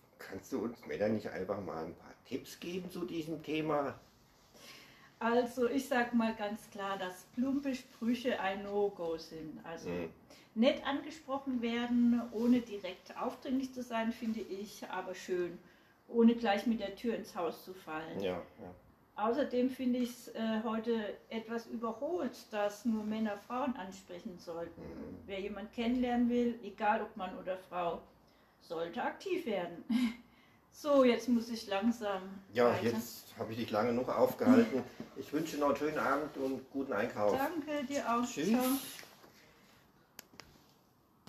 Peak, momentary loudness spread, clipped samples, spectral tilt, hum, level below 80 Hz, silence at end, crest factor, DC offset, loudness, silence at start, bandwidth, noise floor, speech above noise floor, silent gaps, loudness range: -14 dBFS; 15 LU; under 0.1%; -5.5 dB/octave; none; -68 dBFS; 0.9 s; 22 dB; under 0.1%; -36 LUFS; 0.2 s; 14 kHz; -68 dBFS; 33 dB; none; 6 LU